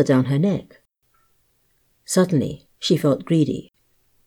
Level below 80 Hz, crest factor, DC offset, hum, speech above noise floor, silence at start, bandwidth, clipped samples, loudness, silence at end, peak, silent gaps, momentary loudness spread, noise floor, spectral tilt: -58 dBFS; 16 dB; under 0.1%; none; 45 dB; 0 s; 19 kHz; under 0.1%; -21 LUFS; 0.65 s; -6 dBFS; none; 10 LU; -65 dBFS; -6 dB/octave